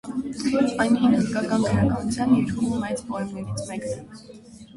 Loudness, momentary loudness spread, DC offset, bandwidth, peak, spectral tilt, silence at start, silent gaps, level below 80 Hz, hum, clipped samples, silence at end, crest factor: -23 LUFS; 12 LU; under 0.1%; 11.5 kHz; -8 dBFS; -6 dB/octave; 0.05 s; none; -48 dBFS; none; under 0.1%; 0.1 s; 16 dB